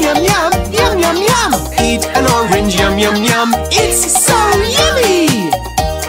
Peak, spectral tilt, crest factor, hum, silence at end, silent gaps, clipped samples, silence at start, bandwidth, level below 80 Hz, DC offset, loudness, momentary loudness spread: 0 dBFS; -3 dB/octave; 12 dB; none; 0 s; none; under 0.1%; 0 s; 16.5 kHz; -26 dBFS; under 0.1%; -11 LUFS; 4 LU